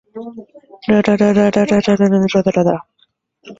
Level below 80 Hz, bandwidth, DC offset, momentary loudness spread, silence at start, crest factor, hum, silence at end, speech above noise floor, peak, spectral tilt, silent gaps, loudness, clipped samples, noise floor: -50 dBFS; 7.8 kHz; under 0.1%; 17 LU; 0.15 s; 16 dB; none; 0.05 s; 46 dB; 0 dBFS; -7 dB/octave; none; -14 LUFS; under 0.1%; -60 dBFS